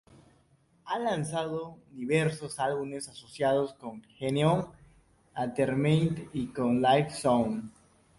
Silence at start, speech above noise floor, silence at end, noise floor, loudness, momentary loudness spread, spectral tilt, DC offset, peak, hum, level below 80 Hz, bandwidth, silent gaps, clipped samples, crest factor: 0.85 s; 37 dB; 0.5 s; -66 dBFS; -29 LUFS; 15 LU; -6 dB/octave; under 0.1%; -12 dBFS; none; -62 dBFS; 11.5 kHz; none; under 0.1%; 18 dB